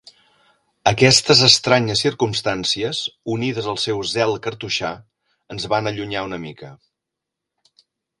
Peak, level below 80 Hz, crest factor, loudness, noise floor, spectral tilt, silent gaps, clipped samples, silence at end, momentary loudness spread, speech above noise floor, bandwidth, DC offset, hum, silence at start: 0 dBFS; -52 dBFS; 20 dB; -18 LUFS; -83 dBFS; -3.5 dB/octave; none; under 0.1%; 1.45 s; 18 LU; 63 dB; 16 kHz; under 0.1%; none; 0.85 s